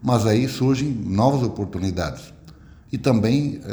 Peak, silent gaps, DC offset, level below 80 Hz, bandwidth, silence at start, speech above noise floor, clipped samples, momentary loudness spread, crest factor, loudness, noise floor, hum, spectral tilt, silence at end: -4 dBFS; none; under 0.1%; -46 dBFS; over 20 kHz; 0 s; 25 dB; under 0.1%; 9 LU; 16 dB; -21 LUFS; -45 dBFS; none; -7 dB/octave; 0 s